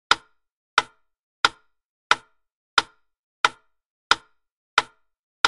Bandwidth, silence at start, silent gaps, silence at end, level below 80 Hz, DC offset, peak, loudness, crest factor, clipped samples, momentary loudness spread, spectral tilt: 11.5 kHz; 0.1 s; 0.52-0.77 s, 1.19-1.43 s, 1.86-2.10 s, 2.52-2.77 s, 3.19-3.44 s, 3.86-4.10 s, 4.52-4.77 s, 5.19-5.44 s; 0 s; -62 dBFS; under 0.1%; -2 dBFS; -24 LUFS; 26 dB; under 0.1%; 1 LU; 0 dB/octave